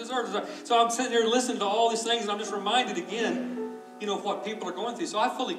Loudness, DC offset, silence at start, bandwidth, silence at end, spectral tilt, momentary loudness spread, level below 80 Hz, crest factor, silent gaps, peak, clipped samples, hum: -28 LUFS; under 0.1%; 0 s; 14 kHz; 0 s; -2.5 dB/octave; 9 LU; -90 dBFS; 18 dB; none; -10 dBFS; under 0.1%; none